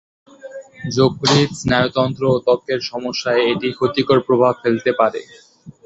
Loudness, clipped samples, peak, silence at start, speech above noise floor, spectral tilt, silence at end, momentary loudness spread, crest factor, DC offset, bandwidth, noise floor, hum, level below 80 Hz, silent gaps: -17 LUFS; under 0.1%; -2 dBFS; 0.45 s; 19 dB; -5.5 dB/octave; 0.15 s; 10 LU; 16 dB; under 0.1%; 8.2 kHz; -36 dBFS; none; -50 dBFS; none